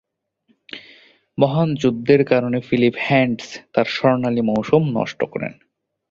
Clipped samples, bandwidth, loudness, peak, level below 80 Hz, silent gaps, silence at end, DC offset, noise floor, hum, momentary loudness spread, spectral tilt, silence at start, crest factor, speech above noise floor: under 0.1%; 7.6 kHz; -19 LUFS; -2 dBFS; -56 dBFS; none; 0.6 s; under 0.1%; -64 dBFS; none; 15 LU; -7 dB/octave; 0.75 s; 18 dB; 46 dB